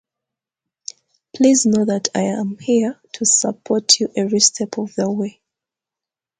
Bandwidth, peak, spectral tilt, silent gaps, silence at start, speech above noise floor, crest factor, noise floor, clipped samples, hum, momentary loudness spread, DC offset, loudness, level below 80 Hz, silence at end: 9.6 kHz; 0 dBFS; -3 dB/octave; none; 1.35 s; 70 dB; 20 dB; -88 dBFS; under 0.1%; none; 13 LU; under 0.1%; -17 LUFS; -64 dBFS; 1.1 s